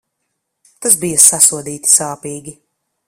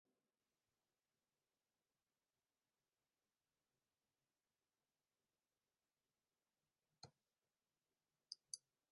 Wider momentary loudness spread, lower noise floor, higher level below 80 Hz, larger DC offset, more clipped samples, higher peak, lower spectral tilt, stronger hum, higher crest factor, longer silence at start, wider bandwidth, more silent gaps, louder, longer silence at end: first, 20 LU vs 12 LU; second, -72 dBFS vs under -90 dBFS; first, -58 dBFS vs under -90 dBFS; neither; first, 0.4% vs under 0.1%; first, 0 dBFS vs -30 dBFS; second, -1.5 dB/octave vs -3 dB/octave; neither; second, 16 dB vs 40 dB; second, 0.8 s vs 7.05 s; first, over 20 kHz vs 1.6 kHz; neither; first, -10 LUFS vs -59 LUFS; first, 0.55 s vs 0.35 s